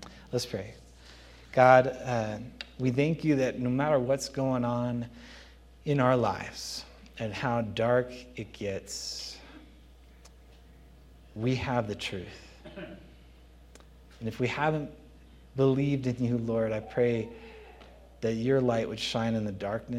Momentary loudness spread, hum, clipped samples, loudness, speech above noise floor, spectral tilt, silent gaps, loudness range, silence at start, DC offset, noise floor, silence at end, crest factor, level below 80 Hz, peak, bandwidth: 19 LU; none; under 0.1%; -29 LUFS; 25 dB; -6 dB/octave; none; 9 LU; 0 s; under 0.1%; -54 dBFS; 0 s; 26 dB; -54 dBFS; -6 dBFS; 14.5 kHz